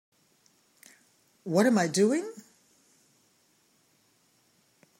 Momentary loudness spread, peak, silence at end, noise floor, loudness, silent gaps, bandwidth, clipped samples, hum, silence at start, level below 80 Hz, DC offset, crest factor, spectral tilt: 21 LU; -10 dBFS; 2.6 s; -68 dBFS; -26 LUFS; none; 16 kHz; under 0.1%; none; 1.45 s; -82 dBFS; under 0.1%; 22 dB; -5 dB/octave